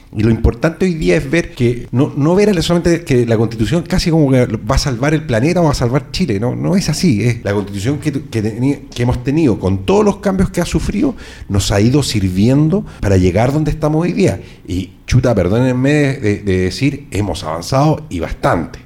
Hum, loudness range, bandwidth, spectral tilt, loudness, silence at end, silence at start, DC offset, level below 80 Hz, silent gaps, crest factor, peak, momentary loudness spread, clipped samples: none; 2 LU; 16 kHz; -6.5 dB/octave; -15 LUFS; 0.05 s; 0.1 s; under 0.1%; -28 dBFS; none; 12 dB; -2 dBFS; 7 LU; under 0.1%